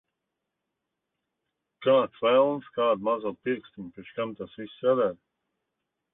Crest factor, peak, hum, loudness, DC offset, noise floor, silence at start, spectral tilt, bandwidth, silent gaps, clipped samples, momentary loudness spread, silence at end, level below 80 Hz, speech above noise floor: 20 dB; -10 dBFS; none; -26 LUFS; under 0.1%; -84 dBFS; 1.8 s; -9.5 dB/octave; 3.9 kHz; none; under 0.1%; 16 LU; 1 s; -72 dBFS; 58 dB